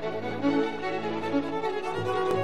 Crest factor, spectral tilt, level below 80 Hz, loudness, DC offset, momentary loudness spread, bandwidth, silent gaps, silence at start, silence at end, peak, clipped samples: 14 dB; -6.5 dB/octave; -66 dBFS; -29 LUFS; 0.9%; 4 LU; 12 kHz; none; 0 s; 0 s; -14 dBFS; under 0.1%